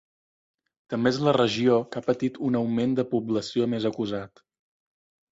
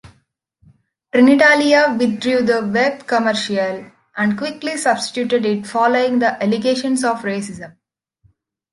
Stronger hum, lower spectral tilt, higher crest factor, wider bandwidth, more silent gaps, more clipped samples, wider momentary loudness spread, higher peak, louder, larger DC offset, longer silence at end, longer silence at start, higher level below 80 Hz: neither; first, -6.5 dB/octave vs -4.5 dB/octave; about the same, 18 dB vs 16 dB; second, 7.8 kHz vs 11.5 kHz; neither; neither; second, 9 LU vs 12 LU; second, -8 dBFS vs -2 dBFS; second, -25 LUFS vs -16 LUFS; neither; about the same, 1.05 s vs 1.05 s; first, 0.9 s vs 0.05 s; about the same, -64 dBFS vs -60 dBFS